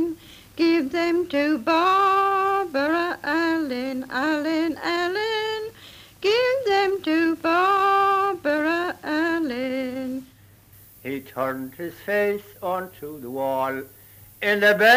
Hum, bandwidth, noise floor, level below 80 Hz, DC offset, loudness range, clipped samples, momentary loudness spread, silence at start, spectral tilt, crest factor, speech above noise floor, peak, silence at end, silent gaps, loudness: none; 16 kHz; -51 dBFS; -60 dBFS; under 0.1%; 7 LU; under 0.1%; 14 LU; 0 s; -4.5 dB/octave; 20 dB; 29 dB; -2 dBFS; 0 s; none; -23 LUFS